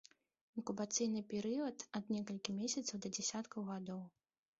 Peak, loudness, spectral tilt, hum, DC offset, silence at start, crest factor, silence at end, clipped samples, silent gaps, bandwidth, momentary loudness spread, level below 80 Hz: -20 dBFS; -42 LUFS; -5 dB/octave; none; under 0.1%; 0.55 s; 22 dB; 0.5 s; under 0.1%; none; 8 kHz; 10 LU; -82 dBFS